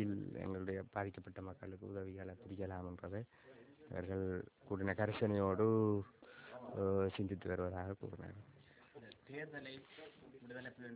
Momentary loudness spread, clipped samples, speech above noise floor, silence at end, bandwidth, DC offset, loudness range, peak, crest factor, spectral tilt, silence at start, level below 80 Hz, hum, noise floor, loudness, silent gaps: 22 LU; under 0.1%; 21 dB; 0 s; 4 kHz; under 0.1%; 10 LU; -22 dBFS; 20 dB; -7 dB/octave; 0 s; -62 dBFS; none; -62 dBFS; -42 LUFS; none